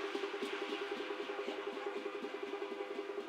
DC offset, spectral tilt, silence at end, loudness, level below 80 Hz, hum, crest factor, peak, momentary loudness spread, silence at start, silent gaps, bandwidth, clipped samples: under 0.1%; -3 dB/octave; 0 s; -42 LUFS; under -90 dBFS; none; 16 dB; -26 dBFS; 3 LU; 0 s; none; 14 kHz; under 0.1%